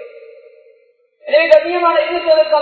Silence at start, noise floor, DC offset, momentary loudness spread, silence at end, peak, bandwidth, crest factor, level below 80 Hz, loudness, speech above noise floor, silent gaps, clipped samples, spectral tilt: 0 s; -54 dBFS; under 0.1%; 6 LU; 0 s; 0 dBFS; 7.2 kHz; 14 dB; -58 dBFS; -13 LUFS; 42 dB; none; 0.2%; -3.5 dB/octave